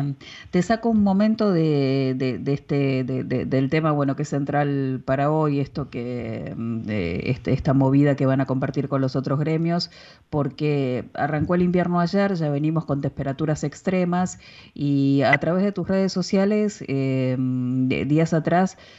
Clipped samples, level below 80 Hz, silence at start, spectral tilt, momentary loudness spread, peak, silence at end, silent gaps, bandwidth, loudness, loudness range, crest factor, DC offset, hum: under 0.1%; -50 dBFS; 0 s; -7.5 dB/octave; 8 LU; -6 dBFS; 0.15 s; none; 8 kHz; -22 LUFS; 2 LU; 16 dB; under 0.1%; none